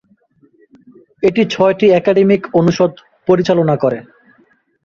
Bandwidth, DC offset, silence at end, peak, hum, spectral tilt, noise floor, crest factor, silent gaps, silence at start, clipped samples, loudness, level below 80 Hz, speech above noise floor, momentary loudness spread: 7.2 kHz; under 0.1%; 0.85 s; 0 dBFS; none; -7 dB/octave; -54 dBFS; 14 dB; none; 1.2 s; under 0.1%; -13 LUFS; -52 dBFS; 42 dB; 6 LU